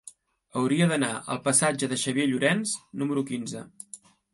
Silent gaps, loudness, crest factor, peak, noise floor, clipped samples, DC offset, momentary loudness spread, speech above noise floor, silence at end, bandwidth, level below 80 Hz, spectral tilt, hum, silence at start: none; -26 LUFS; 18 dB; -8 dBFS; -52 dBFS; under 0.1%; under 0.1%; 18 LU; 26 dB; 0.35 s; 12 kHz; -70 dBFS; -4 dB/octave; none; 0.05 s